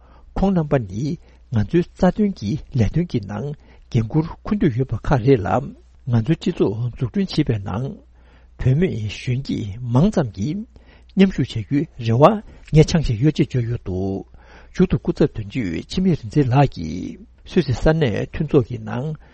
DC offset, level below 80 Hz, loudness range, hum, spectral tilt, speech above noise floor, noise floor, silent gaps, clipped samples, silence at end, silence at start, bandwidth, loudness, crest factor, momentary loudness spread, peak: under 0.1%; -36 dBFS; 4 LU; none; -8 dB/octave; 29 dB; -48 dBFS; none; under 0.1%; 0.2 s; 0.35 s; 8.4 kHz; -20 LUFS; 20 dB; 11 LU; 0 dBFS